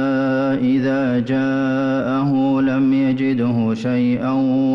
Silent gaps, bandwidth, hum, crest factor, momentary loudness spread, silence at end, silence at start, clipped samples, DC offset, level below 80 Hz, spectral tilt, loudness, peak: none; 6.2 kHz; none; 8 dB; 2 LU; 0 s; 0 s; under 0.1%; under 0.1%; -56 dBFS; -8.5 dB/octave; -18 LUFS; -10 dBFS